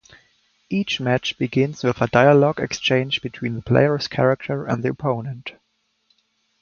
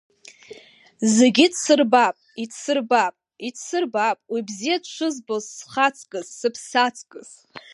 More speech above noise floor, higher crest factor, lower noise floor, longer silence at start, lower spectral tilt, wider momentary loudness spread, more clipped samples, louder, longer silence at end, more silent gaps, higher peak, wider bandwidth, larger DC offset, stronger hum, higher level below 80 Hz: first, 47 dB vs 27 dB; about the same, 20 dB vs 20 dB; first, -67 dBFS vs -48 dBFS; first, 0.7 s vs 0.5 s; first, -6 dB/octave vs -3 dB/octave; second, 12 LU vs 17 LU; neither; about the same, -20 LUFS vs -21 LUFS; first, 1.1 s vs 0.15 s; neither; about the same, 0 dBFS vs -2 dBFS; second, 7 kHz vs 11.5 kHz; neither; neither; first, -54 dBFS vs -76 dBFS